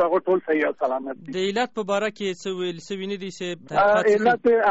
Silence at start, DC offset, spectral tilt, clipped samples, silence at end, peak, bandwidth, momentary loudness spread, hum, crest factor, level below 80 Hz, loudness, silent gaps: 0 s; 0.2%; -3 dB/octave; under 0.1%; 0 s; -10 dBFS; 8 kHz; 12 LU; none; 12 dB; -62 dBFS; -23 LUFS; none